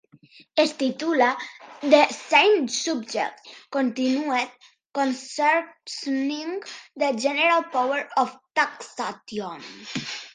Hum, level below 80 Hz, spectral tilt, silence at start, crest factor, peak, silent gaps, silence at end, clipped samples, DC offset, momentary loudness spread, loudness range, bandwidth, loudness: none; -78 dBFS; -2.5 dB/octave; 0.55 s; 22 dB; -2 dBFS; 4.86-4.90 s; 0.05 s; under 0.1%; under 0.1%; 15 LU; 4 LU; 10 kHz; -24 LUFS